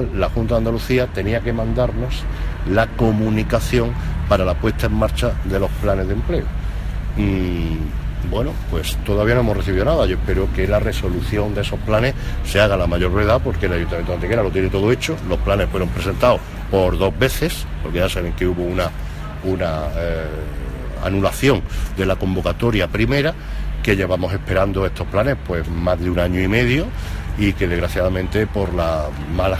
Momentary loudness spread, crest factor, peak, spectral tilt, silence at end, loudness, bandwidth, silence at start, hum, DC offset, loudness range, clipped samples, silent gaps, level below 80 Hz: 8 LU; 16 dB; -2 dBFS; -6.5 dB/octave; 0 s; -20 LUFS; 15.5 kHz; 0 s; none; under 0.1%; 3 LU; under 0.1%; none; -24 dBFS